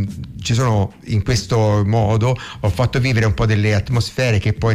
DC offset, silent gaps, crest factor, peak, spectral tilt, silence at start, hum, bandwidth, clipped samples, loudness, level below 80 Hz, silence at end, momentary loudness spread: under 0.1%; none; 10 dB; -8 dBFS; -6 dB/octave; 0 s; none; 12.5 kHz; under 0.1%; -18 LUFS; -34 dBFS; 0 s; 5 LU